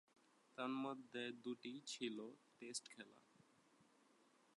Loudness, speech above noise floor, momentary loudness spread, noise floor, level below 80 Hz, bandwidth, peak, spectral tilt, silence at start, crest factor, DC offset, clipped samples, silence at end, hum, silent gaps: -50 LUFS; 25 dB; 13 LU; -75 dBFS; under -90 dBFS; 11 kHz; -32 dBFS; -3 dB/octave; 0.55 s; 20 dB; under 0.1%; under 0.1%; 0.75 s; none; none